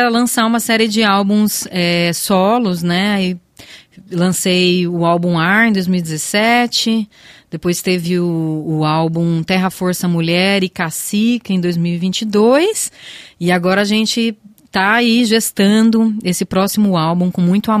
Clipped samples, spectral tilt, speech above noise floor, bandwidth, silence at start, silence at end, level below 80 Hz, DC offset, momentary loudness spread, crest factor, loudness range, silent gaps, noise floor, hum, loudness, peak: under 0.1%; -4.5 dB/octave; 26 dB; 15.5 kHz; 0 s; 0 s; -54 dBFS; under 0.1%; 7 LU; 14 dB; 2 LU; none; -40 dBFS; none; -14 LUFS; 0 dBFS